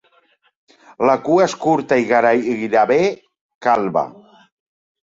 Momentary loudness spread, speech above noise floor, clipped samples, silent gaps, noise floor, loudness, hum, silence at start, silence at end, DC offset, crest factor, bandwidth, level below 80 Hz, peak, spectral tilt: 8 LU; 43 dB; under 0.1%; 3.41-3.49 s, 3.55-3.61 s; -59 dBFS; -17 LUFS; none; 1 s; 0.9 s; under 0.1%; 16 dB; 8 kHz; -62 dBFS; -2 dBFS; -5.5 dB/octave